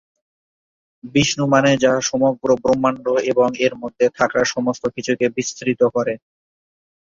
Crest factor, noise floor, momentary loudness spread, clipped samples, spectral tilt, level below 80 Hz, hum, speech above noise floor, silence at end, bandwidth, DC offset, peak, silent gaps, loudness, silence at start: 18 dB; under -90 dBFS; 7 LU; under 0.1%; -4.5 dB/octave; -54 dBFS; none; over 72 dB; 0.85 s; 7.6 kHz; under 0.1%; -2 dBFS; none; -18 LUFS; 1.05 s